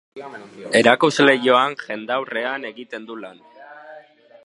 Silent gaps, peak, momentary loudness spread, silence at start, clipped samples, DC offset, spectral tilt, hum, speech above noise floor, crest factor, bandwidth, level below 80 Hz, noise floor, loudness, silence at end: none; 0 dBFS; 22 LU; 0.15 s; under 0.1%; under 0.1%; -4 dB/octave; none; 26 dB; 20 dB; 11.5 kHz; -72 dBFS; -46 dBFS; -18 LUFS; 0.45 s